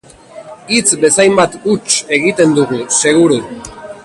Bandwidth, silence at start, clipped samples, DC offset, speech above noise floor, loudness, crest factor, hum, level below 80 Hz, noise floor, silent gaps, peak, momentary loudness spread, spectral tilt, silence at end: 11.5 kHz; 0.35 s; under 0.1%; under 0.1%; 23 dB; -11 LUFS; 12 dB; none; -50 dBFS; -35 dBFS; none; 0 dBFS; 15 LU; -3 dB/octave; 0.05 s